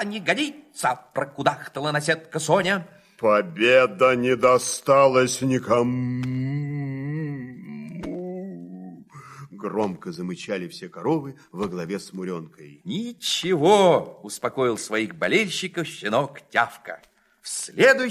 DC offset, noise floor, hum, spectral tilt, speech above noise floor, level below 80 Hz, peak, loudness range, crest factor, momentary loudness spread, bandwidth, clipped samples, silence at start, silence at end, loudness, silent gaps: under 0.1%; -43 dBFS; none; -4.5 dB/octave; 21 dB; -64 dBFS; -2 dBFS; 13 LU; 20 dB; 18 LU; 15.5 kHz; under 0.1%; 0 s; 0 s; -23 LUFS; none